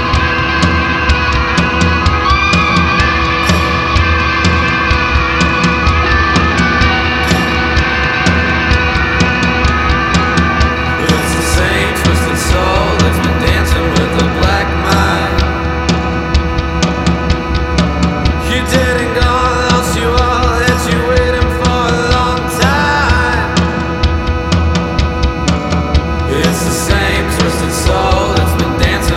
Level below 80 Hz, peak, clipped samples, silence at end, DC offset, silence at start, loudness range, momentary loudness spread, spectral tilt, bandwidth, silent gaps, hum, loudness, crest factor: -18 dBFS; 0 dBFS; under 0.1%; 0 s; under 0.1%; 0 s; 3 LU; 4 LU; -5 dB/octave; 15.5 kHz; none; none; -12 LUFS; 12 dB